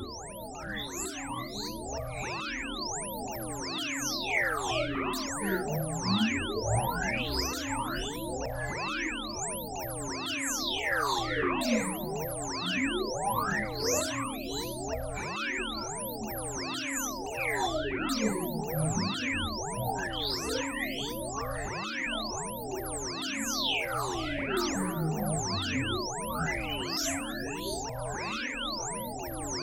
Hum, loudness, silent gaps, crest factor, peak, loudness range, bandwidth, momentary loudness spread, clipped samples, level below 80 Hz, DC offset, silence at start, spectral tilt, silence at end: none; -32 LUFS; none; 18 dB; -16 dBFS; 3 LU; 16.5 kHz; 7 LU; under 0.1%; -48 dBFS; under 0.1%; 0 s; -3.5 dB/octave; 0 s